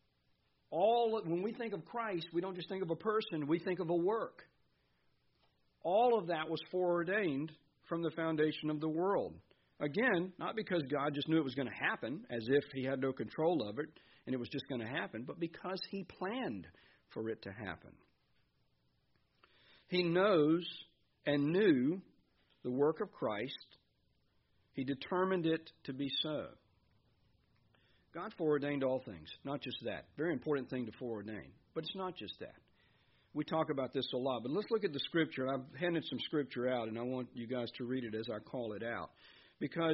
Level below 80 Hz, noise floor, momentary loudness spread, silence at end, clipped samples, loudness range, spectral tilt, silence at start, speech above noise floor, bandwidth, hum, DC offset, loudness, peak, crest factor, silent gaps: -76 dBFS; -77 dBFS; 12 LU; 0 s; under 0.1%; 7 LU; -4 dB/octave; 0.7 s; 40 dB; 5.8 kHz; none; under 0.1%; -37 LUFS; -18 dBFS; 20 dB; none